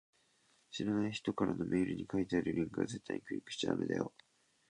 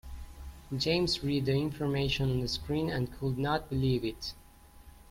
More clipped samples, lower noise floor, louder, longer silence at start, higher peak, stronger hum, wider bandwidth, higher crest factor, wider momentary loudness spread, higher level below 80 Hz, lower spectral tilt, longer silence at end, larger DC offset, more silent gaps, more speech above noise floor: neither; first, -73 dBFS vs -54 dBFS; second, -37 LUFS vs -31 LUFS; first, 0.7 s vs 0.05 s; second, -20 dBFS vs -16 dBFS; neither; second, 10.5 kHz vs 16.5 kHz; about the same, 18 dB vs 16 dB; second, 7 LU vs 12 LU; second, -66 dBFS vs -48 dBFS; about the same, -6 dB/octave vs -6 dB/octave; first, 0.6 s vs 0.15 s; neither; neither; first, 36 dB vs 23 dB